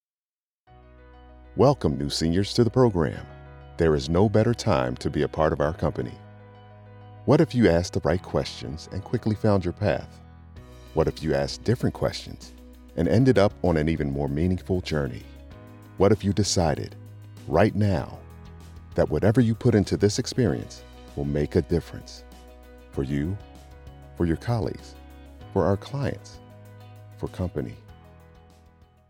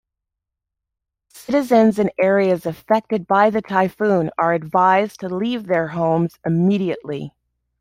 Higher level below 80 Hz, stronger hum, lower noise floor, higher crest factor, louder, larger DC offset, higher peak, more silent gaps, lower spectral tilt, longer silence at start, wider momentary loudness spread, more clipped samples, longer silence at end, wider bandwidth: first, -42 dBFS vs -58 dBFS; neither; first, under -90 dBFS vs -83 dBFS; about the same, 20 dB vs 16 dB; second, -24 LUFS vs -18 LUFS; neither; second, -6 dBFS vs -2 dBFS; neither; about the same, -6.5 dB/octave vs -7.5 dB/octave; first, 1.5 s vs 1.35 s; first, 22 LU vs 9 LU; neither; first, 1.2 s vs 0.5 s; about the same, 15.5 kHz vs 16 kHz